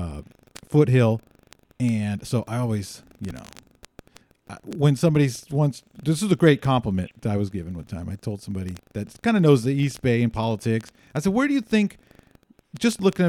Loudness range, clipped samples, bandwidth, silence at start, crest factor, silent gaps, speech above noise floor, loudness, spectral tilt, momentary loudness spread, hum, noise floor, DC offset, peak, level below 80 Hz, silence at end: 5 LU; under 0.1%; 14.5 kHz; 0 s; 20 dB; none; 34 dB; -23 LUFS; -7 dB/octave; 16 LU; none; -57 dBFS; under 0.1%; -4 dBFS; -50 dBFS; 0 s